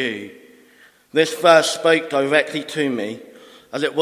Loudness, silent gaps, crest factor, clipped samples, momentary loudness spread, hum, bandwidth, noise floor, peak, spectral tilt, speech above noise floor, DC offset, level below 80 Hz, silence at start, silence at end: -18 LUFS; none; 20 dB; under 0.1%; 18 LU; none; 16 kHz; -52 dBFS; 0 dBFS; -3.5 dB/octave; 33 dB; under 0.1%; -72 dBFS; 0 s; 0 s